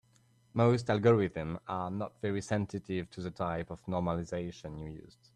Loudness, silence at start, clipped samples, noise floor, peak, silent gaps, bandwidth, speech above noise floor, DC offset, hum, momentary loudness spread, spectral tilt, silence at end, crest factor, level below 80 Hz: -33 LUFS; 0.55 s; under 0.1%; -67 dBFS; -14 dBFS; none; 10 kHz; 34 dB; under 0.1%; none; 15 LU; -7.5 dB/octave; 0.25 s; 18 dB; -60 dBFS